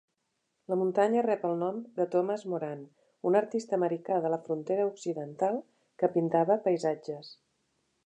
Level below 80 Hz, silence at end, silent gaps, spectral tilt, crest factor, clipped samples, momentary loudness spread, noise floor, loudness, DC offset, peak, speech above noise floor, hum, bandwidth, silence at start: -86 dBFS; 0.75 s; none; -7 dB/octave; 18 dB; under 0.1%; 10 LU; -80 dBFS; -30 LUFS; under 0.1%; -12 dBFS; 51 dB; none; 9.4 kHz; 0.7 s